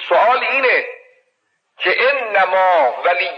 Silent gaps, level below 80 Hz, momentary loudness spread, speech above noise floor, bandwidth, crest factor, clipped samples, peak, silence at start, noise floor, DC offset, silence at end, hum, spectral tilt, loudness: none; under -90 dBFS; 4 LU; 52 dB; 6.6 kHz; 12 dB; under 0.1%; -4 dBFS; 0 s; -67 dBFS; under 0.1%; 0 s; none; -3 dB/octave; -15 LUFS